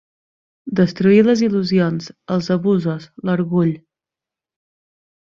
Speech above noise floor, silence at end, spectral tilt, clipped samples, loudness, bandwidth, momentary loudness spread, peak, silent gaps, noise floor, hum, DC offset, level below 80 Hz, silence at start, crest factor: 71 dB; 1.45 s; -7.5 dB/octave; under 0.1%; -18 LUFS; 7.2 kHz; 12 LU; -2 dBFS; none; -88 dBFS; none; under 0.1%; -58 dBFS; 0.65 s; 16 dB